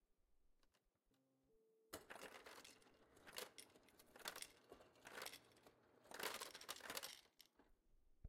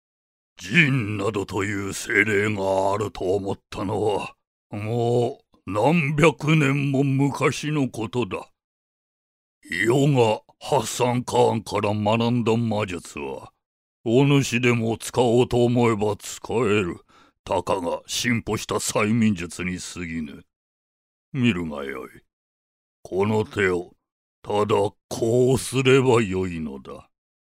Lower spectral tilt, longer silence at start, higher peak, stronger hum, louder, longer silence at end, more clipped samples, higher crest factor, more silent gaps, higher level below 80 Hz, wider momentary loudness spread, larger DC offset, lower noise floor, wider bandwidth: second, -1 dB/octave vs -5.5 dB/octave; second, 0.2 s vs 0.6 s; second, -32 dBFS vs 0 dBFS; neither; second, -55 LUFS vs -22 LUFS; second, 0 s vs 0.55 s; neither; first, 28 dB vs 22 dB; second, none vs 4.47-4.70 s, 8.64-9.61 s, 13.66-14.04 s, 17.39-17.44 s, 20.56-21.32 s, 22.33-23.03 s, 24.12-24.42 s, 25.04-25.09 s; second, -84 dBFS vs -54 dBFS; about the same, 15 LU vs 13 LU; neither; second, -85 dBFS vs under -90 dBFS; about the same, 16.5 kHz vs 16 kHz